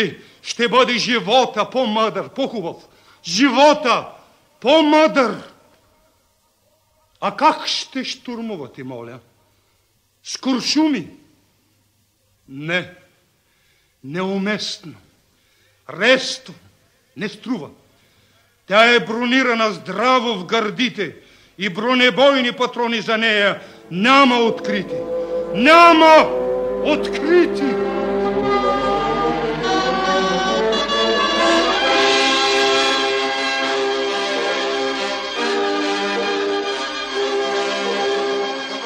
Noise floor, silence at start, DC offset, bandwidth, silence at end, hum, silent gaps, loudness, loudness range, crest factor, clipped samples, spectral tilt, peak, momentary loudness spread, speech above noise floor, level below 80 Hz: -62 dBFS; 0 s; under 0.1%; 15.5 kHz; 0 s; none; none; -17 LUFS; 11 LU; 18 dB; under 0.1%; -3.5 dB/octave; 0 dBFS; 15 LU; 45 dB; -52 dBFS